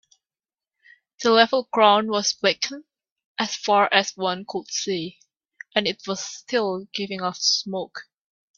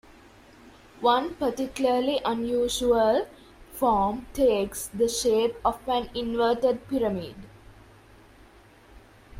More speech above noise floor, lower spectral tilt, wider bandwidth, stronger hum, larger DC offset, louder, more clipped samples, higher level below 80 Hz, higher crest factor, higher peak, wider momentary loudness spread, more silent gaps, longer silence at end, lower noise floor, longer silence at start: first, over 67 dB vs 28 dB; second, -2.5 dB/octave vs -4 dB/octave; second, 7.6 kHz vs 16 kHz; neither; neither; first, -22 LUFS vs -25 LUFS; neither; second, -70 dBFS vs -50 dBFS; first, 24 dB vs 18 dB; first, 0 dBFS vs -10 dBFS; first, 13 LU vs 7 LU; first, 3.12-3.16 s, 3.25-3.35 s vs none; first, 0.55 s vs 0 s; first, under -90 dBFS vs -53 dBFS; first, 1.2 s vs 0.65 s